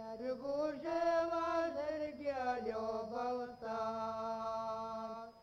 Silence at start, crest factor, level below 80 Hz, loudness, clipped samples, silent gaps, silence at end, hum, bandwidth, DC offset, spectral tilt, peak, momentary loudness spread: 0 s; 14 dB; -70 dBFS; -39 LUFS; under 0.1%; none; 0 s; none; 9.8 kHz; under 0.1%; -5.5 dB/octave; -24 dBFS; 8 LU